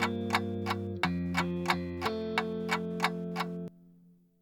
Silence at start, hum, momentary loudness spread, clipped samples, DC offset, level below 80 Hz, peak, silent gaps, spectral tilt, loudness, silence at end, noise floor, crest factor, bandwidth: 0 s; none; 5 LU; under 0.1%; under 0.1%; -66 dBFS; -12 dBFS; none; -5.5 dB/octave; -33 LUFS; 0.5 s; -61 dBFS; 22 dB; 17.5 kHz